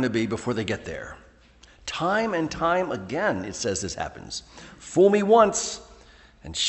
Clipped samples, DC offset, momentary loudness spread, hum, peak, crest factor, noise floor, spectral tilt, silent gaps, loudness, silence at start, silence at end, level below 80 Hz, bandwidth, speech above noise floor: under 0.1%; under 0.1%; 18 LU; none; -4 dBFS; 20 dB; -54 dBFS; -4 dB/octave; none; -24 LUFS; 0 s; 0 s; -52 dBFS; 8.6 kHz; 29 dB